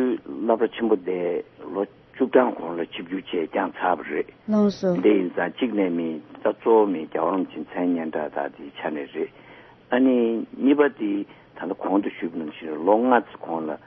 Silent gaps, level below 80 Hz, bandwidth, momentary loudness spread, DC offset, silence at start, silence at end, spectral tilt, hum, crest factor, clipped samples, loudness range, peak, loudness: none; -68 dBFS; 6.2 kHz; 12 LU; under 0.1%; 0 s; 0.1 s; -7.5 dB/octave; none; 20 dB; under 0.1%; 3 LU; -4 dBFS; -24 LUFS